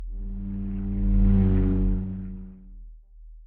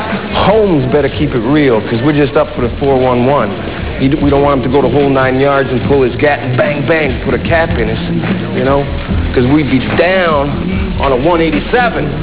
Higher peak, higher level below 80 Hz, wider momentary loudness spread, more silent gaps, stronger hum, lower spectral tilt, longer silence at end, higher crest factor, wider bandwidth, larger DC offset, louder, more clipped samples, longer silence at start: second, -10 dBFS vs -2 dBFS; about the same, -28 dBFS vs -24 dBFS; first, 17 LU vs 5 LU; neither; neither; about the same, -12 dB/octave vs -11 dB/octave; about the same, 0 s vs 0 s; about the same, 14 dB vs 10 dB; second, 2.7 kHz vs 4 kHz; second, under 0.1% vs 2%; second, -26 LUFS vs -11 LUFS; neither; about the same, 0 s vs 0 s